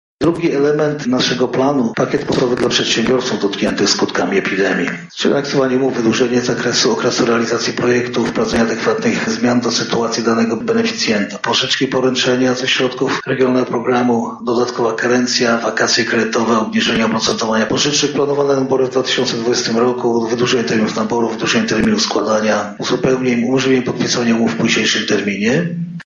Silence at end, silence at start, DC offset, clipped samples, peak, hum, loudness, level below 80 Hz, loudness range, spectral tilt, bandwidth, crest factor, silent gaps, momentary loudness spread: 0.05 s; 0.2 s; under 0.1%; under 0.1%; 0 dBFS; none; -15 LUFS; -50 dBFS; 1 LU; -4 dB/octave; 8 kHz; 14 dB; none; 3 LU